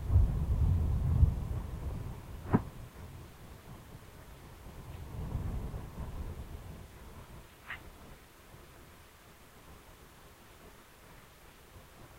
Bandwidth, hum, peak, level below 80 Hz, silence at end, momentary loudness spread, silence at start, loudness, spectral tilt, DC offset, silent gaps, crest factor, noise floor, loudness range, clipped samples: 16 kHz; none; -12 dBFS; -40 dBFS; 0 s; 25 LU; 0 s; -36 LUFS; -7.5 dB/octave; under 0.1%; none; 24 dB; -56 dBFS; 21 LU; under 0.1%